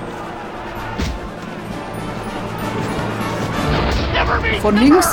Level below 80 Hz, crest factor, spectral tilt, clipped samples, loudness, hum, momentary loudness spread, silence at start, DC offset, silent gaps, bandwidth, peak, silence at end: -30 dBFS; 18 dB; -5 dB/octave; under 0.1%; -20 LUFS; none; 14 LU; 0 s; under 0.1%; none; 18.5 kHz; 0 dBFS; 0 s